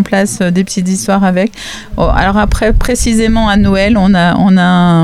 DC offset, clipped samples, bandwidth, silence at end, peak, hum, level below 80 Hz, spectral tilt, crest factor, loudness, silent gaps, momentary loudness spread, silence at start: under 0.1%; under 0.1%; 14.5 kHz; 0 s; 0 dBFS; none; -20 dBFS; -5.5 dB/octave; 10 dB; -10 LUFS; none; 6 LU; 0 s